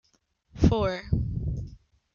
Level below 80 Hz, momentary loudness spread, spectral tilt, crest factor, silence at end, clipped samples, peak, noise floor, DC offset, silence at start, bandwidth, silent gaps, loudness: -36 dBFS; 13 LU; -8 dB/octave; 20 dB; 0.4 s; under 0.1%; -8 dBFS; -69 dBFS; under 0.1%; 0.55 s; 7.2 kHz; none; -28 LUFS